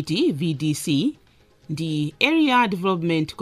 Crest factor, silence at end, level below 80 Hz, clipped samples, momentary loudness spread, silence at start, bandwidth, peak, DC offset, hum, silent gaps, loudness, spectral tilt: 20 dB; 0 s; -60 dBFS; under 0.1%; 9 LU; 0 s; 15 kHz; -2 dBFS; under 0.1%; none; none; -22 LUFS; -5.5 dB/octave